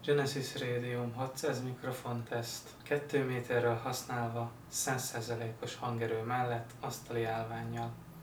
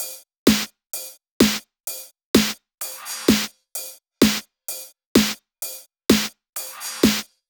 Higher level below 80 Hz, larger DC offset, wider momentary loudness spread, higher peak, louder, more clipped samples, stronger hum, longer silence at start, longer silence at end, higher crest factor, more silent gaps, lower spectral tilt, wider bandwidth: second, -66 dBFS vs -48 dBFS; neither; second, 8 LU vs 13 LU; second, -18 dBFS vs 0 dBFS; second, -37 LUFS vs -22 LUFS; neither; neither; about the same, 0 s vs 0 s; second, 0 s vs 0.25 s; about the same, 18 dB vs 22 dB; second, none vs 0.38-0.46 s, 1.31-1.40 s, 2.25-2.34 s, 5.06-5.15 s, 6.49-6.53 s; first, -4.5 dB/octave vs -3 dB/octave; about the same, over 20 kHz vs over 20 kHz